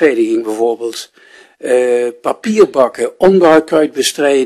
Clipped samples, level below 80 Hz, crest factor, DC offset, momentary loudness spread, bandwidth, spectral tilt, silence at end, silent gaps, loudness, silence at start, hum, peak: under 0.1%; -54 dBFS; 12 dB; under 0.1%; 10 LU; 13.5 kHz; -4.5 dB/octave; 0 s; none; -12 LUFS; 0 s; none; 0 dBFS